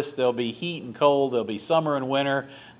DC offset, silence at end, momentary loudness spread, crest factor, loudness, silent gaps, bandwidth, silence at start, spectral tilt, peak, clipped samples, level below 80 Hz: under 0.1%; 0.1 s; 8 LU; 18 dB; -25 LUFS; none; 4 kHz; 0 s; -10 dB/octave; -6 dBFS; under 0.1%; -70 dBFS